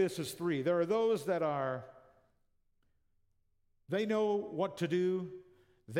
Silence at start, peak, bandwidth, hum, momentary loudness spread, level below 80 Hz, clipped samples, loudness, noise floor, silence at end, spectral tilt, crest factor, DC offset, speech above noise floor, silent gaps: 0 s; -20 dBFS; 16.5 kHz; none; 8 LU; -78 dBFS; under 0.1%; -34 LUFS; -74 dBFS; 0 s; -6 dB/octave; 14 dB; under 0.1%; 41 dB; none